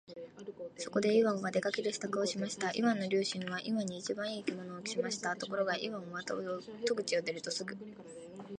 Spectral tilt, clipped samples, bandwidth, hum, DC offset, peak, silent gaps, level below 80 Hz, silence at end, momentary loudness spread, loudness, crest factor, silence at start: -4 dB/octave; under 0.1%; 11 kHz; none; under 0.1%; -16 dBFS; none; -78 dBFS; 0 s; 15 LU; -35 LUFS; 18 dB; 0.1 s